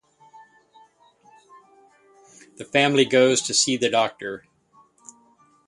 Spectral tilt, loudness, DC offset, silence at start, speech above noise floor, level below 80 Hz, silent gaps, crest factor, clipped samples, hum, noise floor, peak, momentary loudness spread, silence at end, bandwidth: -2.5 dB/octave; -20 LUFS; under 0.1%; 2.6 s; 38 dB; -68 dBFS; none; 22 dB; under 0.1%; none; -59 dBFS; -4 dBFS; 17 LU; 1.3 s; 11.5 kHz